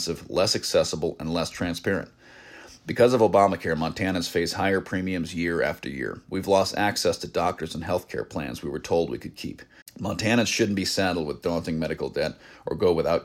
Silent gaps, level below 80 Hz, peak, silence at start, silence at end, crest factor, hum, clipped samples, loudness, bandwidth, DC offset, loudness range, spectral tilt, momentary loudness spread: 9.82-9.86 s; -52 dBFS; -6 dBFS; 0 s; 0 s; 18 dB; none; under 0.1%; -25 LUFS; 16 kHz; under 0.1%; 4 LU; -4.5 dB/octave; 12 LU